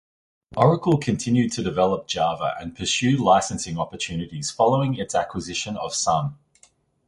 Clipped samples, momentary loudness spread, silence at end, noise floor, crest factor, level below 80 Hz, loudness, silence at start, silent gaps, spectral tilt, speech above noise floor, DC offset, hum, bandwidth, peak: under 0.1%; 9 LU; 0.75 s; -59 dBFS; 20 dB; -50 dBFS; -23 LUFS; 0.5 s; none; -5 dB/octave; 37 dB; under 0.1%; none; 11.5 kHz; -2 dBFS